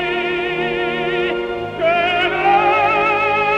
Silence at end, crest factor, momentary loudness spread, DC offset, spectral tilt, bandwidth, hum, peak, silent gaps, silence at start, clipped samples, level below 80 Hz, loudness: 0 s; 14 dB; 6 LU; under 0.1%; -5.5 dB/octave; 8.6 kHz; none; -4 dBFS; none; 0 s; under 0.1%; -46 dBFS; -17 LUFS